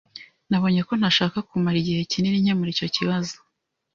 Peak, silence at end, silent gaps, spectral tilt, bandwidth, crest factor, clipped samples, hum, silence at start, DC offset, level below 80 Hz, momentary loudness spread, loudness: -6 dBFS; 0.6 s; none; -5.5 dB/octave; 7.4 kHz; 18 dB; under 0.1%; none; 0.15 s; under 0.1%; -58 dBFS; 11 LU; -23 LUFS